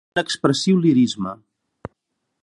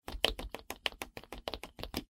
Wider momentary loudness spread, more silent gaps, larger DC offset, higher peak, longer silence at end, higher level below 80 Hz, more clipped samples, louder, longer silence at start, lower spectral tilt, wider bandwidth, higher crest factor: first, 24 LU vs 12 LU; neither; neither; first, -2 dBFS vs -6 dBFS; first, 1.1 s vs 0.1 s; second, -58 dBFS vs -50 dBFS; neither; first, -19 LUFS vs -39 LUFS; about the same, 0.15 s vs 0.05 s; first, -5.5 dB/octave vs -2.5 dB/octave; second, 11 kHz vs 17 kHz; second, 18 dB vs 34 dB